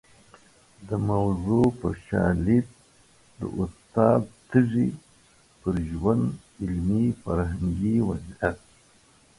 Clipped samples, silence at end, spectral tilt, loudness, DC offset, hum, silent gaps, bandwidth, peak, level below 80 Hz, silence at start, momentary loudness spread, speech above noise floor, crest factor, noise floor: under 0.1%; 0.8 s; -9 dB/octave; -26 LUFS; under 0.1%; none; none; 11.5 kHz; -6 dBFS; -42 dBFS; 0.8 s; 11 LU; 34 dB; 20 dB; -58 dBFS